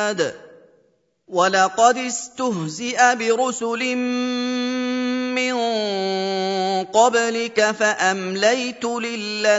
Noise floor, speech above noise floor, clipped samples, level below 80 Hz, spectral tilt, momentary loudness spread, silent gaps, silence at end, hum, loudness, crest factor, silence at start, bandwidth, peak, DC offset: -62 dBFS; 43 dB; under 0.1%; -72 dBFS; -3 dB/octave; 8 LU; none; 0 s; none; -20 LUFS; 20 dB; 0 s; 8 kHz; -2 dBFS; under 0.1%